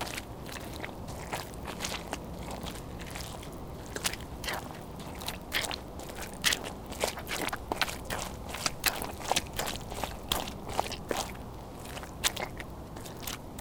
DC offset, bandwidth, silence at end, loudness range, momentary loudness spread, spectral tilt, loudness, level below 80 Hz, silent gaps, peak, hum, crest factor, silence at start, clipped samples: under 0.1%; 19 kHz; 0 s; 6 LU; 12 LU; -2.5 dB/octave; -35 LUFS; -48 dBFS; none; -8 dBFS; none; 30 dB; 0 s; under 0.1%